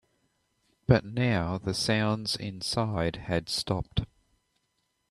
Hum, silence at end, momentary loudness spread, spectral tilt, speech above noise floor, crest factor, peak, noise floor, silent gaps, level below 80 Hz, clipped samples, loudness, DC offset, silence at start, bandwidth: none; 1.05 s; 8 LU; -5.5 dB/octave; 48 dB; 22 dB; -8 dBFS; -77 dBFS; none; -50 dBFS; under 0.1%; -29 LUFS; under 0.1%; 0.9 s; 13 kHz